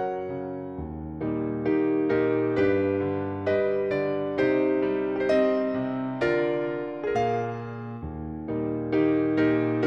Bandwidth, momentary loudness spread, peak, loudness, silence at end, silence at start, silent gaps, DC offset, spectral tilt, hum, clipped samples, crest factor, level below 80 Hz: 6.8 kHz; 12 LU; -10 dBFS; -26 LUFS; 0 s; 0 s; none; under 0.1%; -8.5 dB/octave; none; under 0.1%; 14 dB; -52 dBFS